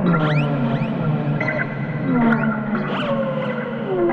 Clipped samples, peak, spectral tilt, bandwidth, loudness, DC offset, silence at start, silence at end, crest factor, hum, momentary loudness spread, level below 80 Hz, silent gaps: under 0.1%; -4 dBFS; -9 dB/octave; 5.4 kHz; -21 LUFS; under 0.1%; 0 s; 0 s; 14 dB; none; 6 LU; -50 dBFS; none